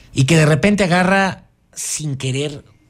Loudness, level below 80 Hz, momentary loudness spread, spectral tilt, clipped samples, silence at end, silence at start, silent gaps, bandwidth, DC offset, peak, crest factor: -16 LUFS; -44 dBFS; 14 LU; -5 dB/octave; under 0.1%; 0.3 s; 0.15 s; none; 14.5 kHz; under 0.1%; -4 dBFS; 14 dB